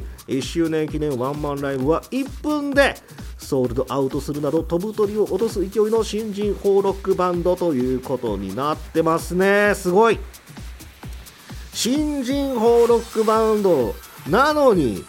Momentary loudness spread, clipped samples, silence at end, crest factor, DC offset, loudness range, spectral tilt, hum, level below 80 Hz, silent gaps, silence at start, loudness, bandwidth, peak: 18 LU; under 0.1%; 0 s; 18 dB; under 0.1%; 3 LU; -5.5 dB/octave; none; -38 dBFS; none; 0 s; -20 LUFS; 17 kHz; -2 dBFS